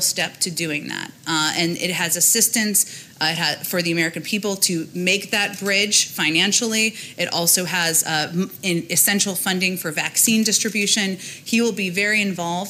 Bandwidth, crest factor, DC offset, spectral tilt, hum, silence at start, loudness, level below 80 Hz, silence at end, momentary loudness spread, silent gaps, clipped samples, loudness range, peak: 16.5 kHz; 18 dB; under 0.1%; -2 dB/octave; none; 0 s; -19 LUFS; -68 dBFS; 0 s; 8 LU; none; under 0.1%; 1 LU; -2 dBFS